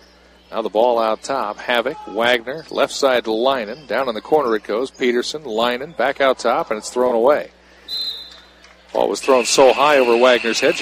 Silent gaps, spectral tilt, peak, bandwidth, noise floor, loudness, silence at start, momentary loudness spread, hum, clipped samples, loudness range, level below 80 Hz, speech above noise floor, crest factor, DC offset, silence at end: none; -2.5 dB/octave; -2 dBFS; 15.5 kHz; -49 dBFS; -18 LUFS; 0.5 s; 11 LU; none; under 0.1%; 4 LU; -56 dBFS; 31 dB; 18 dB; under 0.1%; 0 s